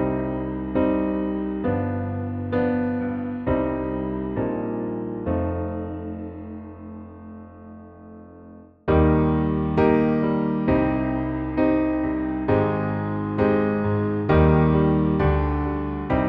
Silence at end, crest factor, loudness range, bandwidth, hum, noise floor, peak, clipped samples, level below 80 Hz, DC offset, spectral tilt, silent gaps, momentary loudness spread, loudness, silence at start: 0 s; 16 dB; 9 LU; 5.2 kHz; none; -45 dBFS; -6 dBFS; under 0.1%; -34 dBFS; under 0.1%; -11 dB/octave; none; 18 LU; -23 LUFS; 0 s